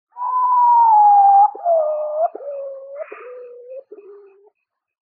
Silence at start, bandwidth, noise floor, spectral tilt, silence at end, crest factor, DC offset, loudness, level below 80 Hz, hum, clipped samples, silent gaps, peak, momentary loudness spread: 0.15 s; 2.8 kHz; -68 dBFS; -6.5 dB/octave; 1.25 s; 12 dB; under 0.1%; -14 LUFS; under -90 dBFS; none; under 0.1%; none; -6 dBFS; 24 LU